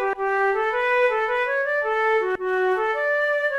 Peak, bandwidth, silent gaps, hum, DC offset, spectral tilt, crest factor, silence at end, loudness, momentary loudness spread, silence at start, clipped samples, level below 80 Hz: -10 dBFS; 12.5 kHz; none; none; under 0.1%; -3.5 dB/octave; 12 dB; 0 s; -22 LUFS; 3 LU; 0 s; under 0.1%; -58 dBFS